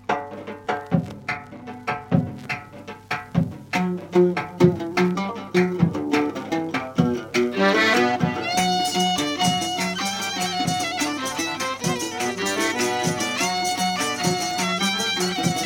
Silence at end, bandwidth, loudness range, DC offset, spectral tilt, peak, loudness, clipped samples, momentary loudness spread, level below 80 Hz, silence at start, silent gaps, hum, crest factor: 0 s; 19 kHz; 5 LU; under 0.1%; -4 dB/octave; -2 dBFS; -23 LUFS; under 0.1%; 10 LU; -56 dBFS; 0.1 s; none; none; 20 dB